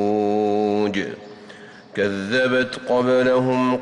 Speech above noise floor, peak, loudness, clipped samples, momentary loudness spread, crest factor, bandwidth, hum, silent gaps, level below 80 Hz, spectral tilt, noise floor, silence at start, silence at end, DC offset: 23 dB; -10 dBFS; -20 LUFS; under 0.1%; 18 LU; 10 dB; 10.5 kHz; none; none; -60 dBFS; -6 dB/octave; -42 dBFS; 0 s; 0 s; under 0.1%